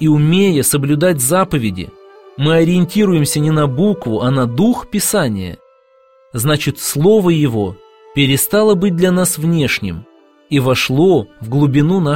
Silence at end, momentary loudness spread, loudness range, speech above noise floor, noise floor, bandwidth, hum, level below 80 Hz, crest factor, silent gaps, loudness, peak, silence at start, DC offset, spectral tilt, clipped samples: 0 s; 9 LU; 3 LU; 37 dB; -50 dBFS; 16.5 kHz; none; -44 dBFS; 14 dB; none; -14 LUFS; 0 dBFS; 0 s; 0.4%; -5.5 dB/octave; under 0.1%